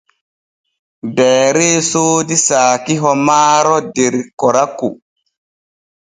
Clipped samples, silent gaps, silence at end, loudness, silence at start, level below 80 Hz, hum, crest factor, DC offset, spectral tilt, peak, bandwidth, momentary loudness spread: under 0.1%; 4.33-4.37 s; 1.15 s; -12 LUFS; 1.05 s; -60 dBFS; none; 14 dB; under 0.1%; -3.5 dB/octave; 0 dBFS; 11 kHz; 8 LU